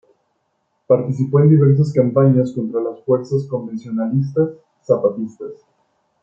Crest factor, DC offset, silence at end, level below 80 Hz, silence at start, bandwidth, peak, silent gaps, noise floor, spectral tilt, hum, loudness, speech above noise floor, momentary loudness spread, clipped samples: 16 dB; under 0.1%; 0.7 s; -60 dBFS; 0.9 s; 7.4 kHz; -2 dBFS; none; -68 dBFS; -11 dB/octave; none; -17 LUFS; 52 dB; 13 LU; under 0.1%